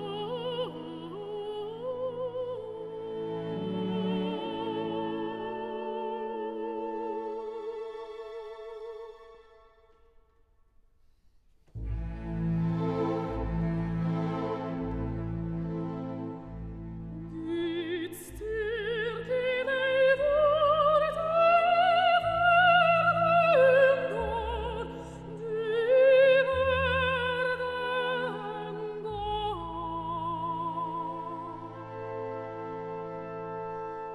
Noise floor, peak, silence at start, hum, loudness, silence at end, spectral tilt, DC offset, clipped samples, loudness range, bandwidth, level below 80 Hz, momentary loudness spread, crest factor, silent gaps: -64 dBFS; -12 dBFS; 0 s; none; -29 LUFS; 0 s; -6.5 dB/octave; under 0.1%; under 0.1%; 15 LU; 13.5 kHz; -48 dBFS; 17 LU; 18 dB; none